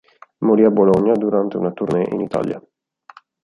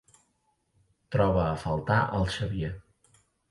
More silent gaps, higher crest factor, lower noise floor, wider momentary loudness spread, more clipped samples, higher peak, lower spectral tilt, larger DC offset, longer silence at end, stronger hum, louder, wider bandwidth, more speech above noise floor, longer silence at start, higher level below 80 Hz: neither; about the same, 16 dB vs 18 dB; second, -47 dBFS vs -73 dBFS; about the same, 10 LU vs 9 LU; neither; first, -2 dBFS vs -12 dBFS; first, -9.5 dB/octave vs -7 dB/octave; neither; first, 0.85 s vs 0.7 s; neither; first, -17 LUFS vs -28 LUFS; about the same, 10.5 kHz vs 11.5 kHz; second, 30 dB vs 46 dB; second, 0.4 s vs 1.1 s; second, -56 dBFS vs -44 dBFS